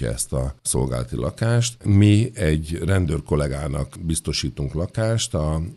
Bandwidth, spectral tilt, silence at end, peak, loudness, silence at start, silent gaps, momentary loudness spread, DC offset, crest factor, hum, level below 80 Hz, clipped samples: 13 kHz; -5.5 dB/octave; 0 s; -4 dBFS; -22 LUFS; 0 s; none; 9 LU; under 0.1%; 18 dB; none; -34 dBFS; under 0.1%